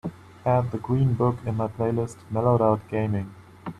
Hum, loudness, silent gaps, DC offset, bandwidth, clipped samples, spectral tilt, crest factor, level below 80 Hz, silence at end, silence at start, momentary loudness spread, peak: none; -25 LUFS; none; under 0.1%; 10.5 kHz; under 0.1%; -9.5 dB/octave; 18 dB; -52 dBFS; 0.1 s; 0.05 s; 10 LU; -8 dBFS